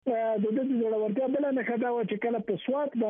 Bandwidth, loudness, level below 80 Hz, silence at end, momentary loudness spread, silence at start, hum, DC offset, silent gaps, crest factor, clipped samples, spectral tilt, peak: 3.7 kHz; -29 LUFS; -78 dBFS; 0 s; 2 LU; 0.05 s; none; under 0.1%; none; 12 dB; under 0.1%; -6 dB/octave; -18 dBFS